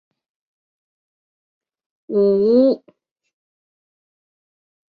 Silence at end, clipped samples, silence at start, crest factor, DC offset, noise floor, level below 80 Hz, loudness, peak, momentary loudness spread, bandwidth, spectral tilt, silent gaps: 2.2 s; under 0.1%; 2.1 s; 18 dB; under 0.1%; -58 dBFS; -66 dBFS; -17 LUFS; -4 dBFS; 10 LU; 5 kHz; -10.5 dB/octave; none